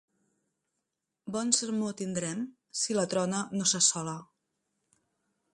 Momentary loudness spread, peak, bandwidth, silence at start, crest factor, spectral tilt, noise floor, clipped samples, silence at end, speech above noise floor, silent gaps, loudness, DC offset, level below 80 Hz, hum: 14 LU; -8 dBFS; 11.5 kHz; 1.25 s; 26 dB; -3 dB/octave; -85 dBFS; under 0.1%; 1.3 s; 55 dB; none; -29 LUFS; under 0.1%; -74 dBFS; none